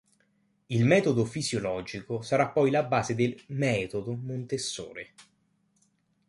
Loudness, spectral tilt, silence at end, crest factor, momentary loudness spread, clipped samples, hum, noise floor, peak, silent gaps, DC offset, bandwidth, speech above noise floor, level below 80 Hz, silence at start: -28 LUFS; -5.5 dB/octave; 1.05 s; 20 dB; 12 LU; under 0.1%; none; -71 dBFS; -8 dBFS; none; under 0.1%; 11.5 kHz; 43 dB; -62 dBFS; 0.7 s